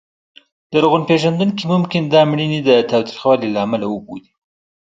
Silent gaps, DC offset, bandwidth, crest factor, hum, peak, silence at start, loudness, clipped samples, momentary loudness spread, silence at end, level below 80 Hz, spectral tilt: none; under 0.1%; 7.8 kHz; 16 dB; none; 0 dBFS; 0.7 s; -16 LUFS; under 0.1%; 9 LU; 0.7 s; -58 dBFS; -7 dB/octave